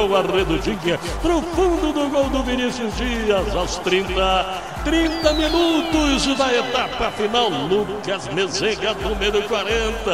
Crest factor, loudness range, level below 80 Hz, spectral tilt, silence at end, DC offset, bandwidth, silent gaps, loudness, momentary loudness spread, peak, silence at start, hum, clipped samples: 18 dB; 2 LU; -32 dBFS; -4 dB/octave; 0 s; 0.4%; 16 kHz; none; -20 LUFS; 5 LU; -2 dBFS; 0 s; none; under 0.1%